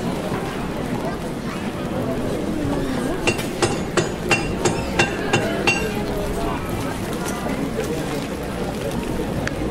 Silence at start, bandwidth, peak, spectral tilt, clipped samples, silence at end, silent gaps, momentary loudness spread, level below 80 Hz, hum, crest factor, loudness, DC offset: 0 s; 16 kHz; -4 dBFS; -5 dB/octave; under 0.1%; 0 s; none; 7 LU; -36 dBFS; none; 18 dB; -23 LUFS; under 0.1%